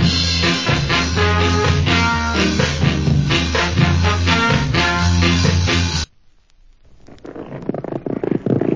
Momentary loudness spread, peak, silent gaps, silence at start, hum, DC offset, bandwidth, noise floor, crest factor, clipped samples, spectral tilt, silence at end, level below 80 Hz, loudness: 11 LU; -2 dBFS; none; 0 s; none; under 0.1%; 7.6 kHz; -50 dBFS; 16 dB; under 0.1%; -5 dB/octave; 0 s; -26 dBFS; -16 LUFS